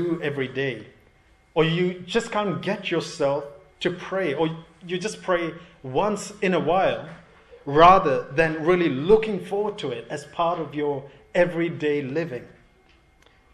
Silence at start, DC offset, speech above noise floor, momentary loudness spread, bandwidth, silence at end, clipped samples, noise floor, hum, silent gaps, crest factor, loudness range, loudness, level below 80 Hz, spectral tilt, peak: 0 s; under 0.1%; 34 dB; 13 LU; 12 kHz; 1.05 s; under 0.1%; -58 dBFS; none; none; 22 dB; 7 LU; -24 LUFS; -52 dBFS; -6 dB/octave; -2 dBFS